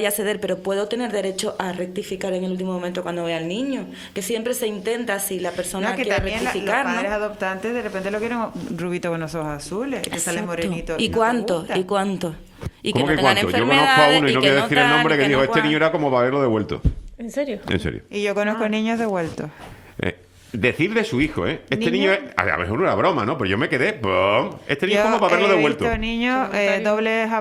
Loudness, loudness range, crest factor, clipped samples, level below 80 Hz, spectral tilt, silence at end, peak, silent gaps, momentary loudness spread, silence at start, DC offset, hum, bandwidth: -21 LUFS; 9 LU; 20 dB; under 0.1%; -42 dBFS; -4.5 dB/octave; 0 s; 0 dBFS; none; 12 LU; 0 s; under 0.1%; none; 16 kHz